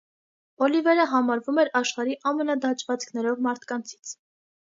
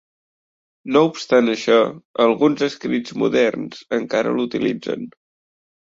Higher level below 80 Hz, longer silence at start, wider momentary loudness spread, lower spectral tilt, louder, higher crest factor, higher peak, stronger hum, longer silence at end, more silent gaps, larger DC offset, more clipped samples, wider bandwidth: second, -82 dBFS vs -64 dBFS; second, 0.6 s vs 0.85 s; about the same, 13 LU vs 11 LU; second, -3 dB/octave vs -5.5 dB/octave; second, -25 LUFS vs -19 LUFS; about the same, 18 dB vs 18 dB; second, -8 dBFS vs -2 dBFS; neither; about the same, 0.65 s vs 0.75 s; second, none vs 2.05-2.14 s; neither; neither; about the same, 7.8 kHz vs 7.8 kHz